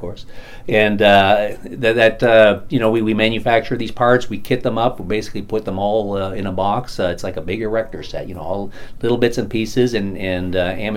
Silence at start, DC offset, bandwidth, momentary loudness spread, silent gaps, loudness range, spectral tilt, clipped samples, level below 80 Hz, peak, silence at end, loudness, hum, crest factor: 0 s; under 0.1%; 16.5 kHz; 14 LU; none; 7 LU; -6 dB/octave; under 0.1%; -36 dBFS; 0 dBFS; 0 s; -17 LUFS; none; 18 dB